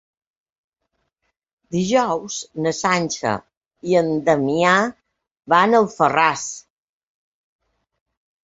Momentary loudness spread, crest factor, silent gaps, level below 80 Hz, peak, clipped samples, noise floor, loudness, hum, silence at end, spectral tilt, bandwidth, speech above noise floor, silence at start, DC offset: 12 LU; 20 dB; 3.57-3.61 s; -60 dBFS; -2 dBFS; under 0.1%; -74 dBFS; -19 LUFS; none; 1.85 s; -4.5 dB/octave; 8 kHz; 56 dB; 1.7 s; under 0.1%